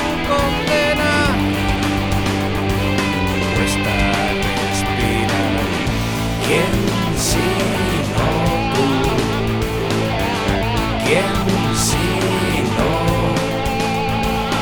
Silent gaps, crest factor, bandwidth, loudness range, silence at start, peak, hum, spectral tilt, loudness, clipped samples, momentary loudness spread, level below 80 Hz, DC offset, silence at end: none; 16 dB; over 20 kHz; 1 LU; 0 s; -2 dBFS; none; -5 dB/octave; -18 LUFS; under 0.1%; 3 LU; -28 dBFS; 0.2%; 0 s